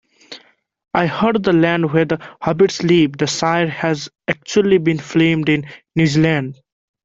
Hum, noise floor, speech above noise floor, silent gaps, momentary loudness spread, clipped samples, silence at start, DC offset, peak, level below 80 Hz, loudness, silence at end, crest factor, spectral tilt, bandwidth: none; -46 dBFS; 30 dB; none; 9 LU; under 0.1%; 0.3 s; under 0.1%; 0 dBFS; -52 dBFS; -17 LUFS; 0.5 s; 16 dB; -6 dB/octave; 7.8 kHz